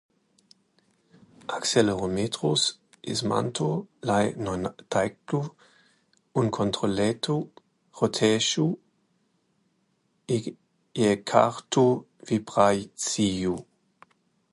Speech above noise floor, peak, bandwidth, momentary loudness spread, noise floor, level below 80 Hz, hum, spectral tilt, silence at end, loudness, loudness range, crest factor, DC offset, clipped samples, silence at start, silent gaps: 46 dB; -2 dBFS; 11.5 kHz; 9 LU; -71 dBFS; -58 dBFS; none; -4.5 dB/octave; 0.9 s; -26 LUFS; 4 LU; 24 dB; under 0.1%; under 0.1%; 1.5 s; none